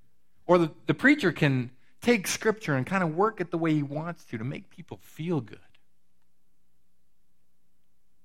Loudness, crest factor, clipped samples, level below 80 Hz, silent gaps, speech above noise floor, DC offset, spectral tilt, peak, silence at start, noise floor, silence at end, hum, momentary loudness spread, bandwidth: -27 LUFS; 22 dB; under 0.1%; -66 dBFS; none; 50 dB; 0.3%; -5.5 dB/octave; -6 dBFS; 0.5 s; -76 dBFS; 2.7 s; none; 18 LU; 16.5 kHz